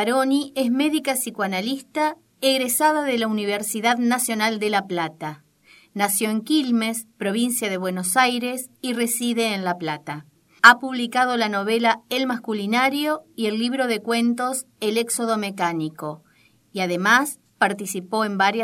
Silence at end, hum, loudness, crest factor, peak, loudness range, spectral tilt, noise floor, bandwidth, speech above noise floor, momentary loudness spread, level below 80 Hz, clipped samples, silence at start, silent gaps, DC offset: 0 s; none; -21 LUFS; 22 dB; 0 dBFS; 4 LU; -3 dB/octave; -54 dBFS; 16.5 kHz; 32 dB; 9 LU; -76 dBFS; under 0.1%; 0 s; none; under 0.1%